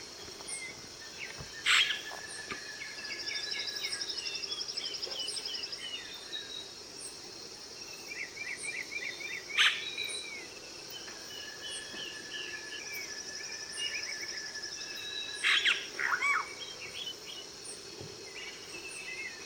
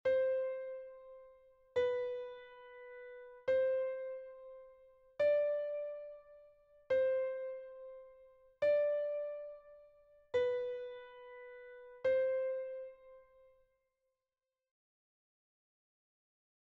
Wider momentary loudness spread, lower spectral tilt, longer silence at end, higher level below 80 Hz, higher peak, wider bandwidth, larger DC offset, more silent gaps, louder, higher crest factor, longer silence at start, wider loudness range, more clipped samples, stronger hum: second, 16 LU vs 21 LU; second, 0.5 dB/octave vs -4.5 dB/octave; second, 0 s vs 3.55 s; first, -70 dBFS vs -78 dBFS; first, -12 dBFS vs -24 dBFS; first, 18 kHz vs 6 kHz; neither; neither; about the same, -35 LUFS vs -37 LUFS; first, 24 dB vs 16 dB; about the same, 0 s vs 0.05 s; first, 8 LU vs 4 LU; neither; neither